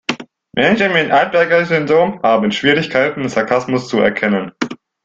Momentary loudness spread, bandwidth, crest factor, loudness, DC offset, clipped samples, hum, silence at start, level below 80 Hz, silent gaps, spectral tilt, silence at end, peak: 11 LU; 7.8 kHz; 14 dB; -15 LUFS; under 0.1%; under 0.1%; none; 0.1 s; -54 dBFS; none; -5.5 dB/octave; 0.3 s; 0 dBFS